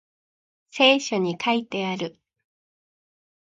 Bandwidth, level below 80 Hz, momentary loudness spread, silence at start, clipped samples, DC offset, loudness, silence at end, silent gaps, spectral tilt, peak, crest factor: 9.2 kHz; -76 dBFS; 15 LU; 0.75 s; under 0.1%; under 0.1%; -22 LUFS; 1.5 s; none; -4 dB/octave; -4 dBFS; 22 dB